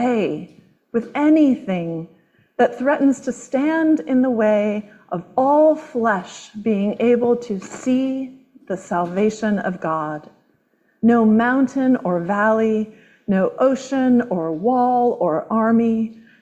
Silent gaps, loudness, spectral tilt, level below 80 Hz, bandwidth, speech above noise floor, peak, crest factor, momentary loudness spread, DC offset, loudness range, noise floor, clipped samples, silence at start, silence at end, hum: none; -19 LUFS; -7 dB/octave; -62 dBFS; 8.4 kHz; 45 dB; -4 dBFS; 14 dB; 13 LU; under 0.1%; 3 LU; -63 dBFS; under 0.1%; 0 s; 0.3 s; none